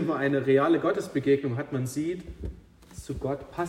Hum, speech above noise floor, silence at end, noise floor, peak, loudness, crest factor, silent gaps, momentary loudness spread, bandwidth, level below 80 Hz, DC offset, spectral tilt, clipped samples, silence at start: none; 20 dB; 0 s; -47 dBFS; -10 dBFS; -27 LUFS; 16 dB; none; 18 LU; 15 kHz; -48 dBFS; under 0.1%; -7 dB/octave; under 0.1%; 0 s